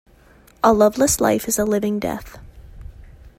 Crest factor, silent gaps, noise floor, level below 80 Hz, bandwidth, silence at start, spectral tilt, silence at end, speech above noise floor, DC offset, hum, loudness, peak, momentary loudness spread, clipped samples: 18 dB; none; -50 dBFS; -42 dBFS; 16 kHz; 0.65 s; -4 dB/octave; 0.35 s; 32 dB; under 0.1%; none; -18 LUFS; -2 dBFS; 10 LU; under 0.1%